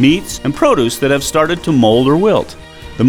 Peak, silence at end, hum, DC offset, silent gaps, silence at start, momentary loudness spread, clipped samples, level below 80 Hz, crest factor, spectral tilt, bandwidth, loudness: 0 dBFS; 0 s; none; under 0.1%; none; 0 s; 13 LU; under 0.1%; -36 dBFS; 12 dB; -5.5 dB/octave; 19.5 kHz; -13 LUFS